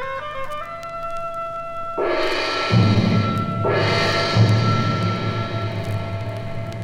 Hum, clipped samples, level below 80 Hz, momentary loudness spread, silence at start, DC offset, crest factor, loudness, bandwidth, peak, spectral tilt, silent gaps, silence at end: 50 Hz at -35 dBFS; under 0.1%; -42 dBFS; 12 LU; 0 s; under 0.1%; 18 dB; -21 LUFS; 10.5 kHz; -4 dBFS; -6.5 dB/octave; none; 0 s